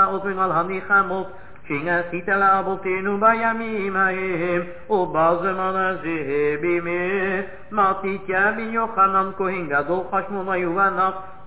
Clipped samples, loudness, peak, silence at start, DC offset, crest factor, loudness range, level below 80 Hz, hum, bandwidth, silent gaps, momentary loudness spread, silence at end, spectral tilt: under 0.1%; -21 LUFS; -6 dBFS; 0 s; 1%; 16 dB; 1 LU; -54 dBFS; none; 4 kHz; none; 7 LU; 0 s; -9.5 dB/octave